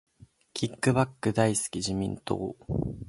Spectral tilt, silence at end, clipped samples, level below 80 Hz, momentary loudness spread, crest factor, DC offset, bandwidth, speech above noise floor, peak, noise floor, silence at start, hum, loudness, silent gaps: -5 dB/octave; 0 s; under 0.1%; -50 dBFS; 8 LU; 22 dB; under 0.1%; 11.5 kHz; 19 dB; -8 dBFS; -48 dBFS; 0.55 s; none; -29 LUFS; none